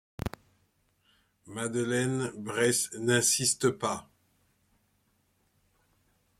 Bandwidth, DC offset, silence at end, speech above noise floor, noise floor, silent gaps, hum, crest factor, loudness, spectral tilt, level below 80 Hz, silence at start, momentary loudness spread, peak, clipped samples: 16.5 kHz; under 0.1%; 2.35 s; 43 dB; -72 dBFS; none; none; 22 dB; -29 LUFS; -3 dB/octave; -58 dBFS; 0.25 s; 15 LU; -12 dBFS; under 0.1%